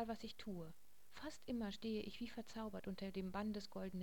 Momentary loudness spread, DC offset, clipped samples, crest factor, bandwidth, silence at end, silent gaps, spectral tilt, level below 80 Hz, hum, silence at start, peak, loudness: 9 LU; 0.2%; under 0.1%; 16 dB; 17 kHz; 0 s; none; -6 dB/octave; -66 dBFS; none; 0 s; -32 dBFS; -48 LUFS